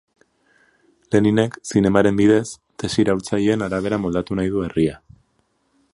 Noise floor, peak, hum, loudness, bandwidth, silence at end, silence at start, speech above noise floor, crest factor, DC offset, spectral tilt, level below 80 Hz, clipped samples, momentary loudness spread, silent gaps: -66 dBFS; 0 dBFS; none; -19 LUFS; 11.5 kHz; 1 s; 1.1 s; 47 dB; 20 dB; under 0.1%; -6.5 dB/octave; -46 dBFS; under 0.1%; 7 LU; none